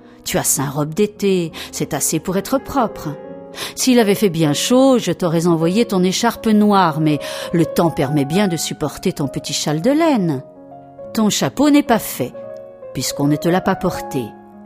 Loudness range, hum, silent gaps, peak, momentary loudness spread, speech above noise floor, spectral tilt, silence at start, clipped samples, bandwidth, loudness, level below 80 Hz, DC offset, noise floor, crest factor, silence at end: 4 LU; none; none; 0 dBFS; 12 LU; 22 dB; -5 dB/octave; 0.25 s; under 0.1%; 16 kHz; -17 LUFS; -48 dBFS; under 0.1%; -38 dBFS; 16 dB; 0 s